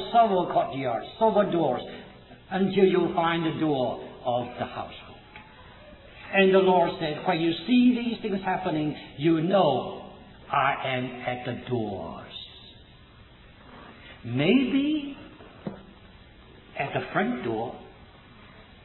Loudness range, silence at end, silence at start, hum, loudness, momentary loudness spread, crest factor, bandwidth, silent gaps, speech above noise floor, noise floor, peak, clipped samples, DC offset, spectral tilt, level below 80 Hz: 9 LU; 0.2 s; 0 s; none; -25 LUFS; 22 LU; 18 dB; 4.2 kHz; none; 27 dB; -51 dBFS; -8 dBFS; under 0.1%; under 0.1%; -10 dB/octave; -56 dBFS